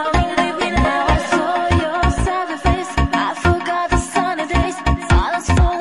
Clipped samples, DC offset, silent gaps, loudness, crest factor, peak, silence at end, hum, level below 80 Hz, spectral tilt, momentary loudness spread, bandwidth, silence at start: under 0.1%; 0.3%; none; -18 LUFS; 12 dB; -4 dBFS; 0 s; none; -22 dBFS; -5.5 dB/octave; 3 LU; 11.5 kHz; 0 s